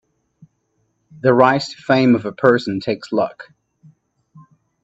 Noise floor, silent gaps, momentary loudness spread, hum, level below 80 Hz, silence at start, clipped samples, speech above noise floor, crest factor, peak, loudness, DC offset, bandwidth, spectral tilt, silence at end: -67 dBFS; none; 9 LU; none; -64 dBFS; 1.25 s; under 0.1%; 51 dB; 20 dB; 0 dBFS; -17 LUFS; under 0.1%; 8 kHz; -6.5 dB/octave; 1.4 s